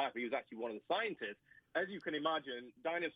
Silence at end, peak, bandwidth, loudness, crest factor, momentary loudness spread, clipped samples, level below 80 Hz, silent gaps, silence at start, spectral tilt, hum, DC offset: 0.05 s; -22 dBFS; 5.8 kHz; -40 LUFS; 18 dB; 8 LU; under 0.1%; -86 dBFS; none; 0 s; -6.5 dB/octave; none; under 0.1%